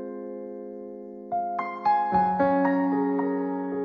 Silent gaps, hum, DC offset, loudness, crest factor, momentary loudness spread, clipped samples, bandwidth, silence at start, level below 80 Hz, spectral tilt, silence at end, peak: none; none; under 0.1%; -25 LUFS; 16 dB; 16 LU; under 0.1%; 5.4 kHz; 0 s; -62 dBFS; -9.5 dB/octave; 0 s; -10 dBFS